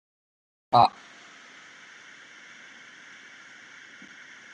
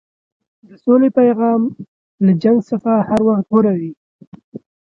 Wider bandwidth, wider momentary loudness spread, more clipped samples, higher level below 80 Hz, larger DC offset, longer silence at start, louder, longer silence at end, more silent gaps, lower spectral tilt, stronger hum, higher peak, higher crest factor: first, 10 kHz vs 7.2 kHz; first, 26 LU vs 10 LU; neither; second, -70 dBFS vs -56 dBFS; neither; about the same, 0.75 s vs 0.85 s; second, -22 LUFS vs -15 LUFS; first, 3.65 s vs 0.3 s; second, none vs 1.88-2.18 s, 3.97-4.19 s, 4.27-4.32 s, 4.44-4.52 s; second, -5 dB/octave vs -10 dB/octave; neither; second, -6 dBFS vs 0 dBFS; first, 26 dB vs 16 dB